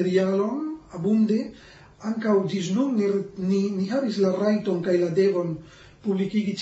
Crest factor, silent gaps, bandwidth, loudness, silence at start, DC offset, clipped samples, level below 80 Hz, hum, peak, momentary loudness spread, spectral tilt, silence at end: 14 dB; none; 8 kHz; -24 LUFS; 0 s; under 0.1%; under 0.1%; -62 dBFS; none; -10 dBFS; 10 LU; -7 dB/octave; 0 s